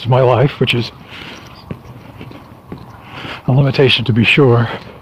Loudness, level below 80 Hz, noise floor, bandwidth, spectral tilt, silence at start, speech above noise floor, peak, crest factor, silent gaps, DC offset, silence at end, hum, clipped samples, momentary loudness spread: -12 LUFS; -44 dBFS; -35 dBFS; 14 kHz; -7 dB/octave; 0 s; 22 dB; 0 dBFS; 14 dB; none; under 0.1%; 0.05 s; none; under 0.1%; 24 LU